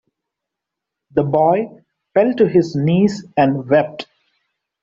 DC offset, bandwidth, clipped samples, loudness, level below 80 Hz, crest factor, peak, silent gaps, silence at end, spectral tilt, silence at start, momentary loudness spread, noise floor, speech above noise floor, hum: under 0.1%; 7.6 kHz; under 0.1%; -17 LUFS; -56 dBFS; 16 dB; -2 dBFS; none; 0.8 s; -8 dB/octave; 1.15 s; 11 LU; -82 dBFS; 67 dB; none